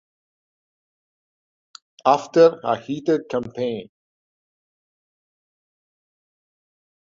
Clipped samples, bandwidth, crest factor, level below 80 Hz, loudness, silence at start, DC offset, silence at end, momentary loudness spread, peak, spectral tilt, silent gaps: under 0.1%; 7.4 kHz; 24 dB; -66 dBFS; -20 LUFS; 2.05 s; under 0.1%; 3.2 s; 12 LU; -2 dBFS; -6 dB/octave; none